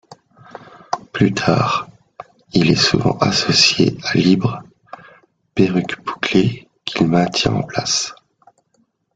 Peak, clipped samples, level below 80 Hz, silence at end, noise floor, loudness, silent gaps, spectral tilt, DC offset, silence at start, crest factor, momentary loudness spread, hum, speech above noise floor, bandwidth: 0 dBFS; under 0.1%; -48 dBFS; 1 s; -63 dBFS; -17 LUFS; none; -4.5 dB/octave; under 0.1%; 0.9 s; 18 dB; 13 LU; none; 47 dB; 9.2 kHz